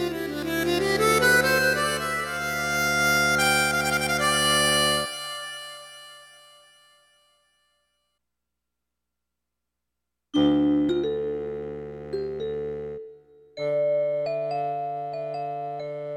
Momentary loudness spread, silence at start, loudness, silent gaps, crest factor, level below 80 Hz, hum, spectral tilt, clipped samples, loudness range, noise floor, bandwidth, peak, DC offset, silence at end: 16 LU; 0 s; -24 LUFS; none; 18 dB; -52 dBFS; 60 Hz at -85 dBFS; -3 dB/octave; under 0.1%; 8 LU; -84 dBFS; 17 kHz; -10 dBFS; under 0.1%; 0 s